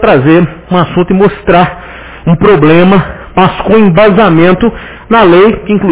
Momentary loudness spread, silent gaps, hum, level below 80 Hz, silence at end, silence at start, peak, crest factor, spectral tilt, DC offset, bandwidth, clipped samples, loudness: 9 LU; none; none; -30 dBFS; 0 s; 0 s; 0 dBFS; 6 dB; -11 dB/octave; under 0.1%; 4 kHz; 5%; -7 LUFS